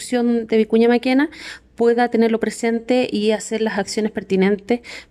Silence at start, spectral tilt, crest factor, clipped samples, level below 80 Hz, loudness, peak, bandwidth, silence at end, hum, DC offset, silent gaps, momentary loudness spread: 0 s; -5 dB/octave; 14 dB; under 0.1%; -56 dBFS; -19 LUFS; -6 dBFS; 13 kHz; 0.1 s; none; under 0.1%; none; 8 LU